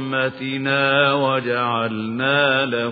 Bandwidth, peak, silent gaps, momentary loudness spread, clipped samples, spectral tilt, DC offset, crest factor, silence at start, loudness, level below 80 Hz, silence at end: 4.9 kHz; -4 dBFS; none; 7 LU; under 0.1%; -8 dB/octave; under 0.1%; 16 dB; 0 s; -19 LUFS; -62 dBFS; 0 s